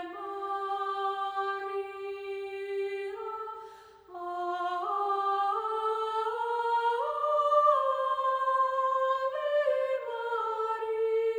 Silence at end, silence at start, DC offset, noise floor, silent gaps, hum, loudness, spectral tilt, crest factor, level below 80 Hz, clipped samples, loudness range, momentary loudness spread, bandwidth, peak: 0 s; 0 s; under 0.1%; -50 dBFS; none; 60 Hz at -80 dBFS; -30 LUFS; -3 dB/octave; 18 dB; -76 dBFS; under 0.1%; 8 LU; 10 LU; over 20 kHz; -12 dBFS